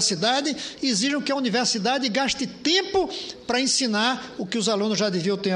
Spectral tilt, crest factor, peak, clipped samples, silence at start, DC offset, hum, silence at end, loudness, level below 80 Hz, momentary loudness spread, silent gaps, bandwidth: -3 dB/octave; 18 dB; -6 dBFS; under 0.1%; 0 s; under 0.1%; none; 0 s; -23 LUFS; -58 dBFS; 6 LU; none; 11 kHz